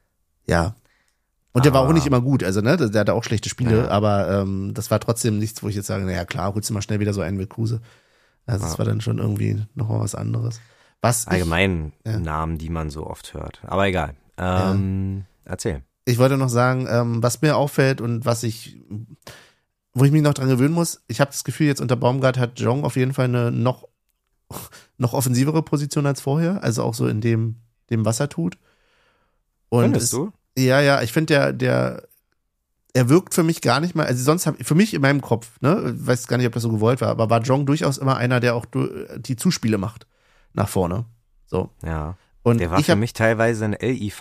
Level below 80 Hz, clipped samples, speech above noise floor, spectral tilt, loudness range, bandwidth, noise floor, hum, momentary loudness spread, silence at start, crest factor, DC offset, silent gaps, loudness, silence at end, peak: -44 dBFS; under 0.1%; 53 dB; -6 dB/octave; 5 LU; 15.5 kHz; -73 dBFS; none; 11 LU; 0.5 s; 20 dB; under 0.1%; none; -21 LUFS; 0 s; -2 dBFS